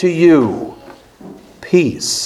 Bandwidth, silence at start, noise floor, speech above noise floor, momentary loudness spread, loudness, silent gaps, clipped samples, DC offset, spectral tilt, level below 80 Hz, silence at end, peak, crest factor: 14 kHz; 0 s; -39 dBFS; 27 dB; 19 LU; -13 LUFS; none; under 0.1%; under 0.1%; -5 dB/octave; -52 dBFS; 0 s; 0 dBFS; 16 dB